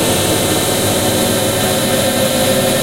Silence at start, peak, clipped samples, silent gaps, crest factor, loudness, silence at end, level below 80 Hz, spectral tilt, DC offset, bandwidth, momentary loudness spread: 0 s; -2 dBFS; under 0.1%; none; 12 dB; -13 LUFS; 0 s; -38 dBFS; -3.5 dB/octave; 0.6%; 16 kHz; 1 LU